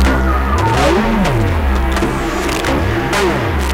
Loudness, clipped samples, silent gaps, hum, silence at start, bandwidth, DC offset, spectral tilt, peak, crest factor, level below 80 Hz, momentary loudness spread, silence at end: -15 LUFS; under 0.1%; none; none; 0 s; 16.5 kHz; under 0.1%; -5.5 dB/octave; -2 dBFS; 12 dB; -18 dBFS; 4 LU; 0 s